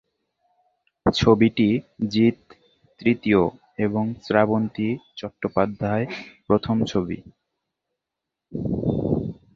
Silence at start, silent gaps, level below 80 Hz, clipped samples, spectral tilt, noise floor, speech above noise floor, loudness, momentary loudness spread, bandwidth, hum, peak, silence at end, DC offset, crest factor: 1.05 s; none; -48 dBFS; under 0.1%; -7 dB/octave; -85 dBFS; 63 dB; -23 LUFS; 12 LU; 7.4 kHz; none; -2 dBFS; 0.2 s; under 0.1%; 22 dB